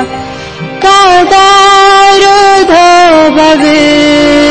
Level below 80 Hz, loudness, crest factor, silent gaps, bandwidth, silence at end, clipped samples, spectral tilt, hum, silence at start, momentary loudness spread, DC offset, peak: -34 dBFS; -3 LUFS; 4 dB; none; 11 kHz; 0 s; 4%; -3 dB/octave; none; 0 s; 14 LU; 2%; 0 dBFS